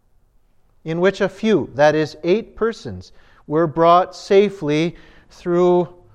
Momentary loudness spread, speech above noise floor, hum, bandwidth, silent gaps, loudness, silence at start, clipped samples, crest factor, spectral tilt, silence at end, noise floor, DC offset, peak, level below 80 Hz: 13 LU; 38 dB; none; 9.2 kHz; none; -18 LUFS; 0.85 s; under 0.1%; 16 dB; -6.5 dB/octave; 0.25 s; -56 dBFS; under 0.1%; -2 dBFS; -52 dBFS